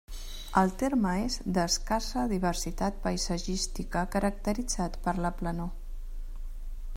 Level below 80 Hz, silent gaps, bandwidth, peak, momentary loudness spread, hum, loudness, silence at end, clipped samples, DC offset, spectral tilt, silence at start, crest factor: -36 dBFS; none; 16 kHz; -10 dBFS; 18 LU; none; -30 LUFS; 0 s; under 0.1%; under 0.1%; -4.5 dB/octave; 0.1 s; 20 dB